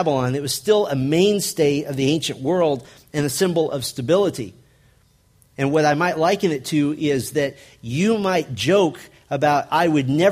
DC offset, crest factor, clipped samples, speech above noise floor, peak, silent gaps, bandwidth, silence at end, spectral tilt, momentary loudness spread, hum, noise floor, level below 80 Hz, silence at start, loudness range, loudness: under 0.1%; 16 dB; under 0.1%; 38 dB; -4 dBFS; none; 15.5 kHz; 0 s; -5 dB/octave; 8 LU; none; -57 dBFS; -56 dBFS; 0 s; 2 LU; -20 LUFS